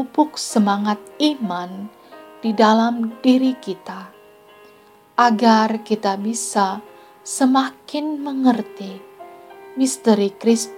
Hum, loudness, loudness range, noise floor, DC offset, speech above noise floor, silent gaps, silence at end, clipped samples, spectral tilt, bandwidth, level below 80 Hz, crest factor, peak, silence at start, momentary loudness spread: none; -19 LUFS; 3 LU; -49 dBFS; under 0.1%; 31 dB; none; 0 s; under 0.1%; -4.5 dB/octave; 16 kHz; -76 dBFS; 18 dB; -2 dBFS; 0 s; 19 LU